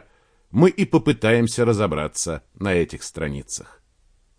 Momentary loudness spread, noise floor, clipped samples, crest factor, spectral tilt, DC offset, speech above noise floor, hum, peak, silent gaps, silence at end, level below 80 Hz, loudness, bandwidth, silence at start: 11 LU; -60 dBFS; under 0.1%; 20 dB; -5.5 dB/octave; under 0.1%; 39 dB; none; -2 dBFS; none; 0.8 s; -44 dBFS; -21 LUFS; 10.5 kHz; 0.55 s